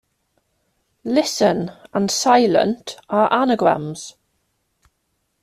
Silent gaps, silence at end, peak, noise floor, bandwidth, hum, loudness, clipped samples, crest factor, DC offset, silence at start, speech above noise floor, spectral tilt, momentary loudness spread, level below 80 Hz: none; 1.3 s; -2 dBFS; -71 dBFS; 14.5 kHz; none; -18 LUFS; under 0.1%; 20 dB; under 0.1%; 1.05 s; 53 dB; -4 dB/octave; 16 LU; -62 dBFS